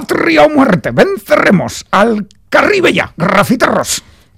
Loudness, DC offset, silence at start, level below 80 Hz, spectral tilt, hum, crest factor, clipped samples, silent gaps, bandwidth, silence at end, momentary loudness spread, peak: -11 LUFS; under 0.1%; 0 s; -42 dBFS; -5 dB/octave; none; 10 dB; under 0.1%; none; 17 kHz; 0.35 s; 6 LU; 0 dBFS